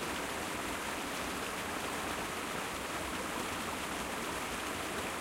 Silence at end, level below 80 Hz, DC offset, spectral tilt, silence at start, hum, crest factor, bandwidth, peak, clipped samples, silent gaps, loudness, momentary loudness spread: 0 s; -56 dBFS; under 0.1%; -2.5 dB/octave; 0 s; none; 14 dB; 16 kHz; -24 dBFS; under 0.1%; none; -37 LUFS; 1 LU